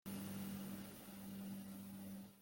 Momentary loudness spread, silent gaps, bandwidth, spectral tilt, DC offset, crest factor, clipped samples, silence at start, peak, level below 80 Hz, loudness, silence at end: 6 LU; none; 17 kHz; -5.5 dB/octave; under 0.1%; 14 dB; under 0.1%; 0.05 s; -38 dBFS; -76 dBFS; -51 LUFS; 0 s